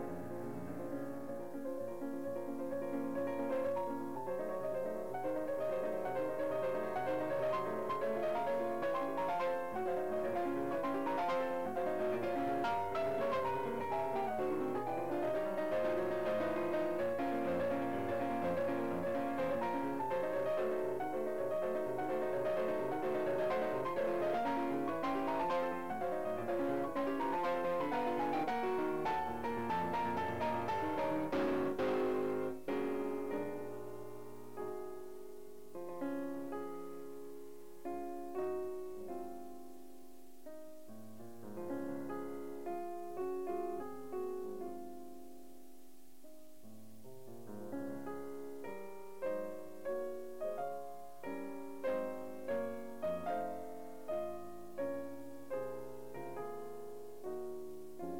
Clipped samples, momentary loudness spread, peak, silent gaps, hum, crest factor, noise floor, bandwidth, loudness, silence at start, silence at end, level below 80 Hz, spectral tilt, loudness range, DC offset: under 0.1%; 14 LU; -26 dBFS; none; none; 12 dB; -62 dBFS; 16 kHz; -39 LUFS; 0 s; 0 s; -70 dBFS; -6.5 dB/octave; 10 LU; 0.4%